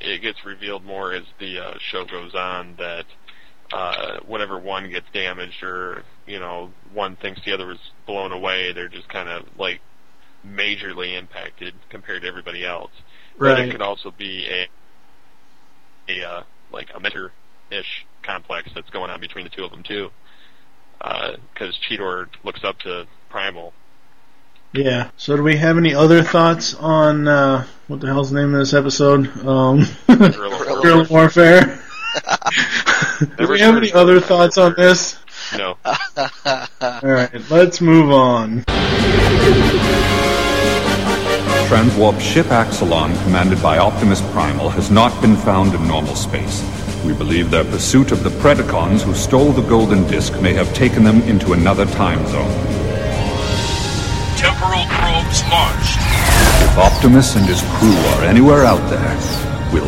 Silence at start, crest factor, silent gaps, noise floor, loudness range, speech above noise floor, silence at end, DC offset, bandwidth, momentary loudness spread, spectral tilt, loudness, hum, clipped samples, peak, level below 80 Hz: 0.05 s; 16 dB; none; -56 dBFS; 16 LU; 41 dB; 0 s; 2%; 16.5 kHz; 19 LU; -5 dB/octave; -14 LUFS; none; under 0.1%; 0 dBFS; -28 dBFS